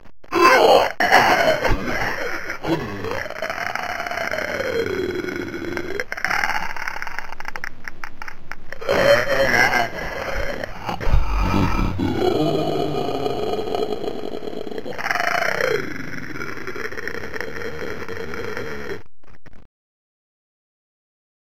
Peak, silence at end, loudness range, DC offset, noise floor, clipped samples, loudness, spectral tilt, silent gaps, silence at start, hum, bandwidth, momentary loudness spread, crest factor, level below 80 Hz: 0 dBFS; 1.95 s; 11 LU; under 0.1%; -46 dBFS; under 0.1%; -22 LUFS; -4.5 dB/octave; none; 0 s; none; 16.5 kHz; 15 LU; 22 dB; -32 dBFS